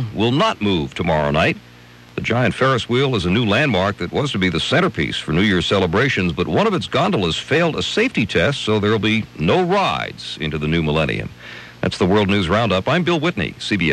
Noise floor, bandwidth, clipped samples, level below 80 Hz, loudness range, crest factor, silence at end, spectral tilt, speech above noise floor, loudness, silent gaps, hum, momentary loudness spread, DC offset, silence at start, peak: -43 dBFS; 12.5 kHz; under 0.1%; -42 dBFS; 2 LU; 14 dB; 0 s; -6 dB/octave; 25 dB; -18 LUFS; none; none; 7 LU; under 0.1%; 0 s; -4 dBFS